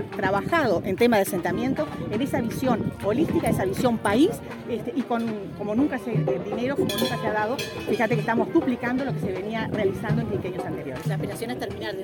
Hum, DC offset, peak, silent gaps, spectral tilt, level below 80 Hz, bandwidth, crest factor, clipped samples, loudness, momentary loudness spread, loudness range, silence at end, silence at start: none; under 0.1%; -8 dBFS; none; -6 dB/octave; -50 dBFS; 17 kHz; 18 dB; under 0.1%; -25 LUFS; 8 LU; 2 LU; 0 s; 0 s